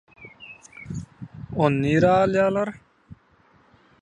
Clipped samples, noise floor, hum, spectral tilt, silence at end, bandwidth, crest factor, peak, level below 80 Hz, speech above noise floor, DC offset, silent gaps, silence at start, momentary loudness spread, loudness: under 0.1%; -58 dBFS; none; -7.5 dB/octave; 1.3 s; 10 kHz; 20 dB; -6 dBFS; -52 dBFS; 39 dB; under 0.1%; none; 0.2 s; 23 LU; -21 LUFS